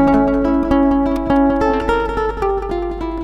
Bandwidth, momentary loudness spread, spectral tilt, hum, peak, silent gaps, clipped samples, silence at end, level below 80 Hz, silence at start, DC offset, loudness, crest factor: 8 kHz; 7 LU; -8 dB/octave; none; -2 dBFS; none; under 0.1%; 0 s; -28 dBFS; 0 s; under 0.1%; -16 LUFS; 14 dB